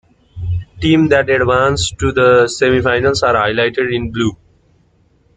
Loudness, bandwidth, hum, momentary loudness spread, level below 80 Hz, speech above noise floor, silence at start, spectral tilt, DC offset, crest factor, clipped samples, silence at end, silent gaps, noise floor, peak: -14 LUFS; 9.4 kHz; none; 9 LU; -38 dBFS; 41 dB; 0.35 s; -5 dB/octave; under 0.1%; 14 dB; under 0.1%; 1 s; none; -54 dBFS; 0 dBFS